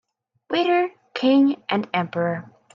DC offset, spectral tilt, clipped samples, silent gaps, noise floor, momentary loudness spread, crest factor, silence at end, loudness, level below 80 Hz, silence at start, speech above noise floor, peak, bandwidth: under 0.1%; -7 dB/octave; under 0.1%; none; -43 dBFS; 9 LU; 14 dB; 0.3 s; -22 LUFS; -70 dBFS; 0.5 s; 22 dB; -8 dBFS; 7 kHz